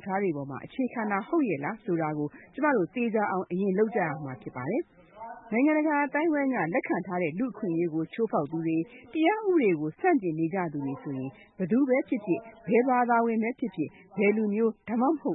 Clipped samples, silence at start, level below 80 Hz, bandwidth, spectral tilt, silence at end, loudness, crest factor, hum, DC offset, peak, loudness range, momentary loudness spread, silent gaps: under 0.1%; 0 s; -72 dBFS; 4 kHz; -11.5 dB/octave; 0 s; -28 LUFS; 16 dB; none; under 0.1%; -12 dBFS; 2 LU; 11 LU; none